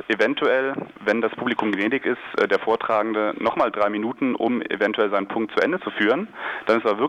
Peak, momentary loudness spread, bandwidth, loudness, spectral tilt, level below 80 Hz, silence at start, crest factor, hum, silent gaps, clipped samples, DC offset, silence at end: -10 dBFS; 4 LU; 9.6 kHz; -22 LUFS; -6 dB/octave; -66 dBFS; 0 s; 14 dB; none; none; under 0.1%; under 0.1%; 0 s